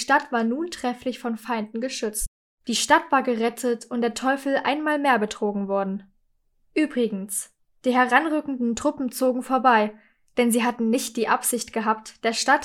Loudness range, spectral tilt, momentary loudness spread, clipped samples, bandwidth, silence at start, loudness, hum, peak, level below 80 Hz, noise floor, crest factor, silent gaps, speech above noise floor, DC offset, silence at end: 3 LU; -3 dB/octave; 10 LU; under 0.1%; 17.5 kHz; 0 s; -24 LUFS; none; -4 dBFS; -52 dBFS; -66 dBFS; 20 dB; 2.28-2.58 s; 43 dB; under 0.1%; 0 s